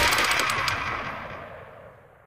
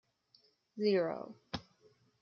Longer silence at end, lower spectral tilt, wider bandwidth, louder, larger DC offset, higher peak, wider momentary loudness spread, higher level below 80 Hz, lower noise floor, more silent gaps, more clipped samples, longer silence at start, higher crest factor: second, 0.3 s vs 0.6 s; second, -1.5 dB/octave vs -7 dB/octave; first, 16 kHz vs 6.6 kHz; first, -24 LUFS vs -36 LUFS; neither; first, -8 dBFS vs -20 dBFS; first, 22 LU vs 14 LU; first, -48 dBFS vs -72 dBFS; second, -49 dBFS vs -71 dBFS; neither; neither; second, 0 s vs 0.75 s; about the same, 20 dB vs 20 dB